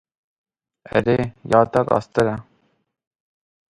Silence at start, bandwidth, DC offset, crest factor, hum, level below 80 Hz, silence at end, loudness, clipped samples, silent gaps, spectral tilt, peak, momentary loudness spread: 0.95 s; 11.5 kHz; under 0.1%; 22 dB; none; -50 dBFS; 1.3 s; -20 LUFS; under 0.1%; none; -7.5 dB/octave; 0 dBFS; 6 LU